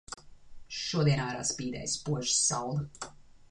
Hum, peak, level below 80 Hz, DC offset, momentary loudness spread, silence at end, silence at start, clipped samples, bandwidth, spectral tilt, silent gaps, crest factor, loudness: none; -14 dBFS; -58 dBFS; under 0.1%; 19 LU; 0.15 s; 0.1 s; under 0.1%; 11 kHz; -3.5 dB/octave; none; 18 dB; -30 LUFS